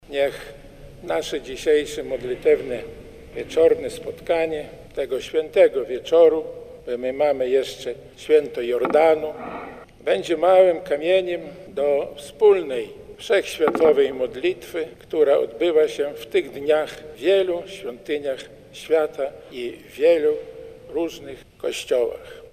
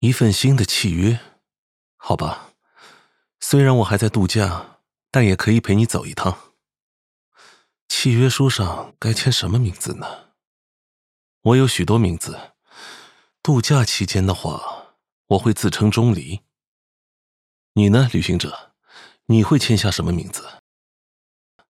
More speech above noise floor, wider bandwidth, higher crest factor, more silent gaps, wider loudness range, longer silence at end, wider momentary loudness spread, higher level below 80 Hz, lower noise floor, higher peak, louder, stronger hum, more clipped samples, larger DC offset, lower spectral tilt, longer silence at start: second, 21 dB vs 39 dB; about the same, 15 kHz vs 15 kHz; about the same, 18 dB vs 20 dB; second, none vs 1.58-1.98 s, 6.82-7.32 s, 7.81-7.89 s, 10.47-11.41 s, 15.12-15.25 s, 16.67-17.75 s; about the same, 4 LU vs 3 LU; second, 0.05 s vs 1.15 s; about the same, 16 LU vs 16 LU; second, -52 dBFS vs -46 dBFS; second, -42 dBFS vs -56 dBFS; second, -4 dBFS vs 0 dBFS; second, -21 LUFS vs -18 LUFS; neither; neither; neither; about the same, -4.5 dB/octave vs -5.5 dB/octave; about the same, 0.1 s vs 0 s